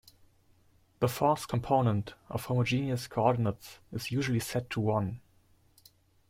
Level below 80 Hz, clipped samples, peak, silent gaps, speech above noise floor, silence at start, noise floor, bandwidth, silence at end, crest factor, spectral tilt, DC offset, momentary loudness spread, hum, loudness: -60 dBFS; under 0.1%; -12 dBFS; none; 35 dB; 1 s; -65 dBFS; 16.5 kHz; 1.1 s; 20 dB; -6.5 dB/octave; under 0.1%; 11 LU; none; -31 LUFS